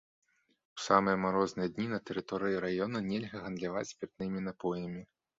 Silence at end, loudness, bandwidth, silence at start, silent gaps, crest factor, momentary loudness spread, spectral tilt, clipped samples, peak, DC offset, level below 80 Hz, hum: 0.35 s; -34 LUFS; 7.6 kHz; 0.75 s; none; 26 dB; 13 LU; -5 dB/octave; under 0.1%; -10 dBFS; under 0.1%; -66 dBFS; none